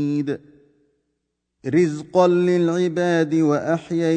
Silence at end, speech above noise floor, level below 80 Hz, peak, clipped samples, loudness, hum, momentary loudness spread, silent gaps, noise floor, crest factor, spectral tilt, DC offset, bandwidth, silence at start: 0 s; 57 dB; -64 dBFS; -4 dBFS; under 0.1%; -20 LUFS; none; 9 LU; none; -76 dBFS; 16 dB; -7 dB/octave; under 0.1%; 9.2 kHz; 0 s